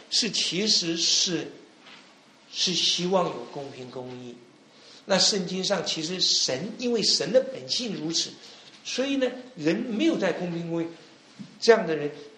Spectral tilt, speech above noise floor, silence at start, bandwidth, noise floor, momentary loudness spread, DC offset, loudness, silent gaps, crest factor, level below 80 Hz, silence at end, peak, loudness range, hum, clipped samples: -2.5 dB/octave; 28 dB; 0 s; 10.5 kHz; -54 dBFS; 17 LU; under 0.1%; -24 LUFS; none; 24 dB; -72 dBFS; 0 s; -4 dBFS; 5 LU; none; under 0.1%